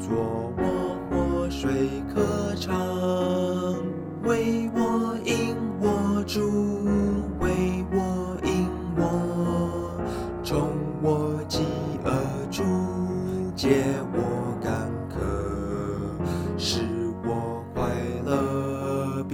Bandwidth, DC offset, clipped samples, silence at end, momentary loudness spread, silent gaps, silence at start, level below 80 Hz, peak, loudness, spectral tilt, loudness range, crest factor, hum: 16.5 kHz; under 0.1%; under 0.1%; 0 s; 5 LU; none; 0 s; -42 dBFS; -8 dBFS; -27 LUFS; -6.5 dB/octave; 3 LU; 18 dB; none